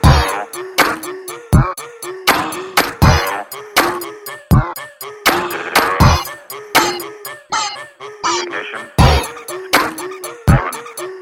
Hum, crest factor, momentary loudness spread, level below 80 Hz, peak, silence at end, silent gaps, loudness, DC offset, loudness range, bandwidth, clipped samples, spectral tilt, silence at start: none; 16 dB; 15 LU; -24 dBFS; 0 dBFS; 0 s; none; -16 LUFS; under 0.1%; 2 LU; 17 kHz; under 0.1%; -4.5 dB/octave; 0 s